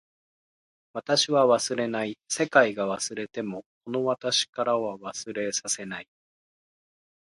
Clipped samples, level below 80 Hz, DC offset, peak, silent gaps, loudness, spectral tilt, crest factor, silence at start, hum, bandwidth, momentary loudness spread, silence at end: under 0.1%; -72 dBFS; under 0.1%; -6 dBFS; 3.66-3.81 s, 4.49-4.53 s; -26 LUFS; -2.5 dB/octave; 24 dB; 0.95 s; none; 11.5 kHz; 15 LU; 1.25 s